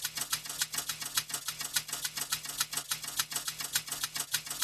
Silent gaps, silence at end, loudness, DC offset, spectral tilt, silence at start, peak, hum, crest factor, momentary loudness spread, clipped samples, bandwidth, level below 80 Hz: none; 0 s; -33 LUFS; under 0.1%; 1 dB/octave; 0 s; -12 dBFS; none; 24 dB; 2 LU; under 0.1%; 15 kHz; -66 dBFS